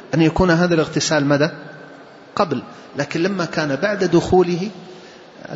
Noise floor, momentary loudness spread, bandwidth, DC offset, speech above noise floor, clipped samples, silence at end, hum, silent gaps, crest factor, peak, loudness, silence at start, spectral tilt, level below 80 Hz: -41 dBFS; 21 LU; 8 kHz; under 0.1%; 23 dB; under 0.1%; 0 s; none; none; 16 dB; -2 dBFS; -18 LUFS; 0 s; -5.5 dB/octave; -44 dBFS